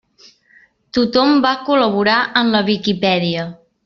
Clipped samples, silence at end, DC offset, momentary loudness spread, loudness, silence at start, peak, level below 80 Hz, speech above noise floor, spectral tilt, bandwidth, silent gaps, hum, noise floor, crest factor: under 0.1%; 0.3 s; under 0.1%; 8 LU; -15 LUFS; 0.95 s; -2 dBFS; -54 dBFS; 37 dB; -6 dB/octave; 7 kHz; none; none; -52 dBFS; 16 dB